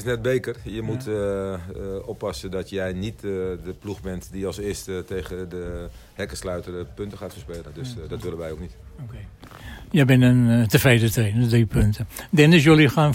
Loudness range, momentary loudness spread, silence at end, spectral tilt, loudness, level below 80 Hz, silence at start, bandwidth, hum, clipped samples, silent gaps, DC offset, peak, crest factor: 15 LU; 21 LU; 0 s; -6.5 dB/octave; -22 LUFS; -40 dBFS; 0 s; 16.5 kHz; none; under 0.1%; none; under 0.1%; -4 dBFS; 18 dB